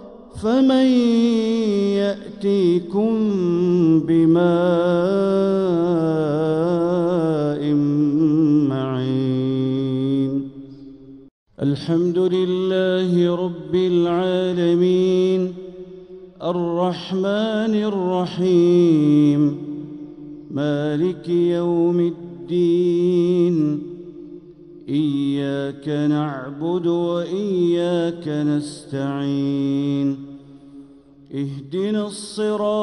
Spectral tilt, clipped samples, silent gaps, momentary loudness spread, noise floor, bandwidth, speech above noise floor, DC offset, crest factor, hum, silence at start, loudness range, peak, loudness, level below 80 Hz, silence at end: -8 dB/octave; under 0.1%; 11.31-11.46 s; 12 LU; -46 dBFS; 11 kHz; 28 dB; under 0.1%; 14 dB; none; 0 s; 5 LU; -6 dBFS; -19 LUFS; -58 dBFS; 0 s